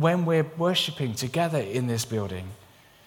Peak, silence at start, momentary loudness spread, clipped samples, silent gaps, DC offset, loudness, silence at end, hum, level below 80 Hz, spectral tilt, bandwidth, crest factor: -8 dBFS; 0 s; 9 LU; under 0.1%; none; under 0.1%; -26 LUFS; 0.5 s; none; -62 dBFS; -5 dB/octave; 18.5 kHz; 18 dB